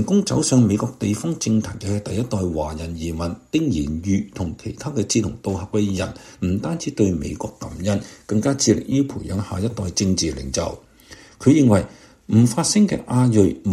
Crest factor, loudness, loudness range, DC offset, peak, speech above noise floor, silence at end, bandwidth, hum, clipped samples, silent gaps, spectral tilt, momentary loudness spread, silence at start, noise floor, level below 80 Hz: 18 dB; -21 LUFS; 5 LU; under 0.1%; -2 dBFS; 25 dB; 0 s; 14 kHz; none; under 0.1%; none; -5.5 dB/octave; 11 LU; 0 s; -45 dBFS; -42 dBFS